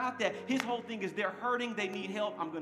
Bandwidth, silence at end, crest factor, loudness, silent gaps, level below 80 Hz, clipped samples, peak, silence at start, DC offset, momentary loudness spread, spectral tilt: 15.5 kHz; 0 s; 22 dB; -35 LUFS; none; -90 dBFS; under 0.1%; -12 dBFS; 0 s; under 0.1%; 3 LU; -4 dB/octave